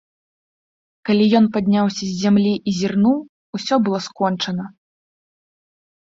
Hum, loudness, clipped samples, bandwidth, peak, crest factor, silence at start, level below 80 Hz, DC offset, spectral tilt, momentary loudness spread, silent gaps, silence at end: none; -19 LUFS; under 0.1%; 7.6 kHz; -2 dBFS; 18 dB; 1.05 s; -60 dBFS; under 0.1%; -6 dB/octave; 13 LU; 3.29-3.53 s; 1.35 s